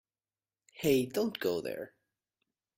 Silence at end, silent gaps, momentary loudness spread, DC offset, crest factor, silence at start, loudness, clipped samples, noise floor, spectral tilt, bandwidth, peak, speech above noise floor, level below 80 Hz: 0.9 s; none; 13 LU; under 0.1%; 20 dB; 0.75 s; -32 LUFS; under 0.1%; under -90 dBFS; -5 dB/octave; 16 kHz; -16 dBFS; over 58 dB; -68 dBFS